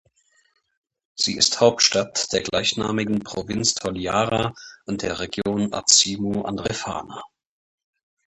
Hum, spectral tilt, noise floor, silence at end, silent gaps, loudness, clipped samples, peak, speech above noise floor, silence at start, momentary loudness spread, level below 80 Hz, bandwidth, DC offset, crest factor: none; -2.5 dB/octave; -63 dBFS; 1 s; none; -21 LUFS; under 0.1%; 0 dBFS; 41 dB; 1.15 s; 14 LU; -52 dBFS; 11.5 kHz; under 0.1%; 24 dB